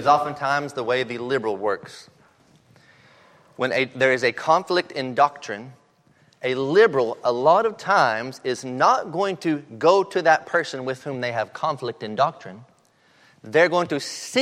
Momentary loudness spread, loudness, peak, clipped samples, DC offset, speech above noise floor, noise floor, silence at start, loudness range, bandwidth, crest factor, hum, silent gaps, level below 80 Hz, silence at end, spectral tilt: 11 LU; -22 LUFS; -4 dBFS; under 0.1%; under 0.1%; 37 dB; -59 dBFS; 0 s; 6 LU; 13.5 kHz; 20 dB; none; none; -72 dBFS; 0 s; -4.5 dB/octave